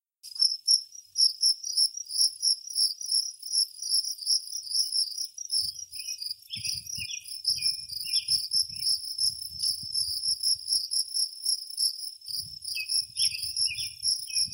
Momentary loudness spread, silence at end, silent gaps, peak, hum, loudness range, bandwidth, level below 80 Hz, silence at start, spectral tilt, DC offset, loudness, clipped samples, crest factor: 10 LU; 0 s; none; -10 dBFS; none; 5 LU; 16.5 kHz; -68 dBFS; 0.25 s; 3.5 dB/octave; under 0.1%; -26 LUFS; under 0.1%; 20 dB